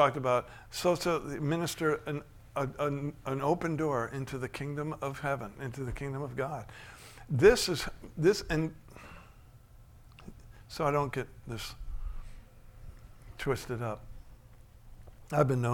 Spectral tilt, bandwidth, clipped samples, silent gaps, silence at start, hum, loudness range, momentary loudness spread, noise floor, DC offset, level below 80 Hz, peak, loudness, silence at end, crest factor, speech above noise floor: -5.5 dB/octave; 18 kHz; under 0.1%; none; 0 s; none; 9 LU; 22 LU; -55 dBFS; under 0.1%; -50 dBFS; -10 dBFS; -32 LUFS; 0 s; 22 dB; 24 dB